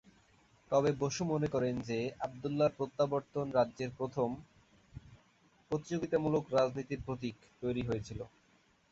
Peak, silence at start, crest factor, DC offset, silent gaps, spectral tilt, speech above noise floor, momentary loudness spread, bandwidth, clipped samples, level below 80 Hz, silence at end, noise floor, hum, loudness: -18 dBFS; 0.7 s; 18 dB; under 0.1%; none; -6.5 dB/octave; 35 dB; 14 LU; 8 kHz; under 0.1%; -62 dBFS; 0.65 s; -69 dBFS; none; -35 LUFS